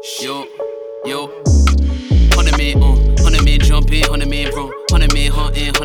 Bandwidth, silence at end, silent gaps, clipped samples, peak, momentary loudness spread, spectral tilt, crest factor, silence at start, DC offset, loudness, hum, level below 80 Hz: 16.5 kHz; 0 s; none; under 0.1%; 0 dBFS; 11 LU; -5 dB/octave; 12 dB; 0 s; under 0.1%; -15 LUFS; none; -14 dBFS